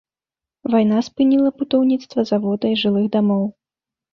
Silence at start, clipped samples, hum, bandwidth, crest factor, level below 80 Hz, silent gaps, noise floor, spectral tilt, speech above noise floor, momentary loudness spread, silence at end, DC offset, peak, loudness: 0.65 s; under 0.1%; none; 6.8 kHz; 14 dB; -62 dBFS; none; -90 dBFS; -7.5 dB/octave; 73 dB; 5 LU; 0.6 s; under 0.1%; -4 dBFS; -18 LUFS